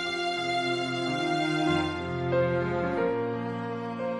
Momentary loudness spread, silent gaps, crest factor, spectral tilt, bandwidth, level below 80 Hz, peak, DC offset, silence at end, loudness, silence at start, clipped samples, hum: 6 LU; none; 14 dB; -5.5 dB/octave; 11 kHz; -62 dBFS; -14 dBFS; under 0.1%; 0 s; -28 LUFS; 0 s; under 0.1%; none